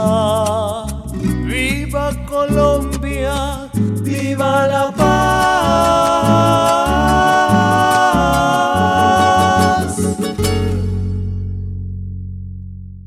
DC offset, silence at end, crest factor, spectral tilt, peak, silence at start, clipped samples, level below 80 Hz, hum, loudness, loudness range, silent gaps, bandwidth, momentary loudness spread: under 0.1%; 0 s; 14 dB; -5.5 dB/octave; 0 dBFS; 0 s; under 0.1%; -28 dBFS; none; -15 LUFS; 5 LU; none; 16 kHz; 13 LU